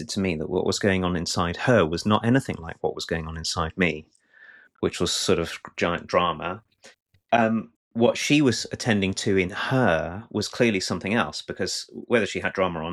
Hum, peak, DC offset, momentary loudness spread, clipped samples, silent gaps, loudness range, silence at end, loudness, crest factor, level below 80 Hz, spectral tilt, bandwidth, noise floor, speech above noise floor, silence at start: none; -6 dBFS; under 0.1%; 9 LU; under 0.1%; 7.02-7.06 s, 7.76-7.91 s; 4 LU; 0 s; -24 LUFS; 18 dB; -50 dBFS; -4.5 dB/octave; 14 kHz; -52 dBFS; 28 dB; 0 s